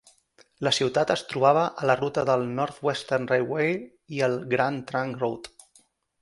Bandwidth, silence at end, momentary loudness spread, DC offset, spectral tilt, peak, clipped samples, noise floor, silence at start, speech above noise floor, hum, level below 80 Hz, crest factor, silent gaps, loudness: 11.5 kHz; 0.75 s; 8 LU; under 0.1%; -5 dB/octave; -6 dBFS; under 0.1%; -62 dBFS; 0.6 s; 37 dB; none; -64 dBFS; 20 dB; none; -25 LUFS